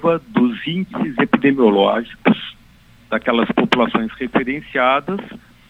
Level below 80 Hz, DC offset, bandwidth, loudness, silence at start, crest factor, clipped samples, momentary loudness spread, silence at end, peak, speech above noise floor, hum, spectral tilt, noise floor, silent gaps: -50 dBFS; under 0.1%; 8.2 kHz; -18 LUFS; 0 s; 18 dB; under 0.1%; 10 LU; 0.3 s; 0 dBFS; 31 dB; none; -7 dB/octave; -48 dBFS; none